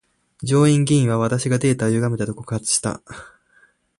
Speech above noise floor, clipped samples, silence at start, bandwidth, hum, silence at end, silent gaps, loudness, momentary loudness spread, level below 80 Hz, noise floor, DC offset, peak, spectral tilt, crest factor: 39 dB; under 0.1%; 0.4 s; 11.5 kHz; none; 0.7 s; none; -19 LUFS; 16 LU; -52 dBFS; -58 dBFS; under 0.1%; -4 dBFS; -5.5 dB/octave; 16 dB